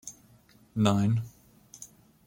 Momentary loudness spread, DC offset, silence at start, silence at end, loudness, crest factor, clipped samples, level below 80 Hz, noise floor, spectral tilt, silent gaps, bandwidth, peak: 22 LU; under 0.1%; 0.05 s; 0.4 s; -28 LUFS; 24 dB; under 0.1%; -62 dBFS; -59 dBFS; -6.5 dB/octave; none; 17 kHz; -8 dBFS